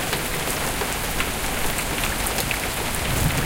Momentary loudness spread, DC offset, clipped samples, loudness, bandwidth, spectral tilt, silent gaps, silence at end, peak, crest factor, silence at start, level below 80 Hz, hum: 2 LU; under 0.1%; under 0.1%; -23 LUFS; 17 kHz; -3 dB/octave; none; 0 s; -6 dBFS; 18 dB; 0 s; -32 dBFS; none